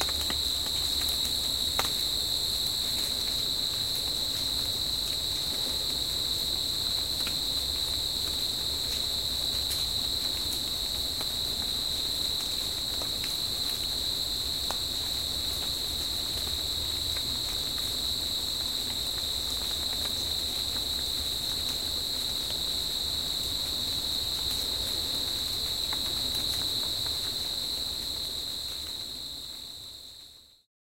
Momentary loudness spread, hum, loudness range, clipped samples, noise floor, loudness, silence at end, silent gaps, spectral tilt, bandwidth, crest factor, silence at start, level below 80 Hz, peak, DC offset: 2 LU; none; 2 LU; under 0.1%; -52 dBFS; -28 LUFS; 0.2 s; none; -1 dB/octave; 16.5 kHz; 24 dB; 0 s; -48 dBFS; -8 dBFS; 0.2%